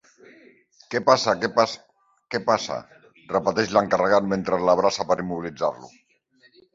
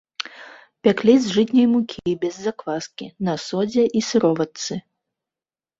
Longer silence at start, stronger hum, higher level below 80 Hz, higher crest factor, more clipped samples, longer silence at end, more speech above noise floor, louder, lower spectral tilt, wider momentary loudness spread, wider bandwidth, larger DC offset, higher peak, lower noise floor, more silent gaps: first, 0.9 s vs 0.2 s; neither; about the same, -60 dBFS vs -62 dBFS; about the same, 22 dB vs 18 dB; neither; second, 0.85 s vs 1 s; second, 38 dB vs over 70 dB; about the same, -22 LUFS vs -20 LUFS; about the same, -4.5 dB/octave vs -5.5 dB/octave; second, 11 LU vs 14 LU; about the same, 7.8 kHz vs 7.8 kHz; neither; about the same, -2 dBFS vs -2 dBFS; second, -60 dBFS vs under -90 dBFS; neither